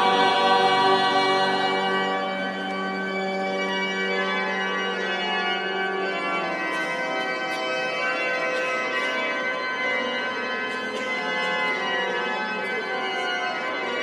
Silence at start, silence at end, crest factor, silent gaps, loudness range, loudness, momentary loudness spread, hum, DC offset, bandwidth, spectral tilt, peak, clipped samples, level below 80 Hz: 0 s; 0 s; 18 dB; none; 3 LU; -24 LUFS; 8 LU; none; under 0.1%; 13 kHz; -3.5 dB/octave; -8 dBFS; under 0.1%; -78 dBFS